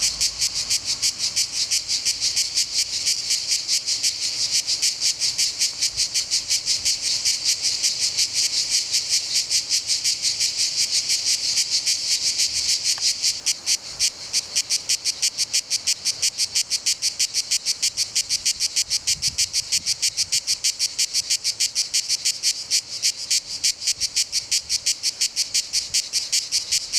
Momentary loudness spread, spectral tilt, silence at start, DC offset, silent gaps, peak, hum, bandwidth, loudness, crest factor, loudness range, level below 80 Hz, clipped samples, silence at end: 3 LU; 3 dB/octave; 0 s; under 0.1%; none; -6 dBFS; none; over 20 kHz; -20 LUFS; 18 dB; 2 LU; -58 dBFS; under 0.1%; 0 s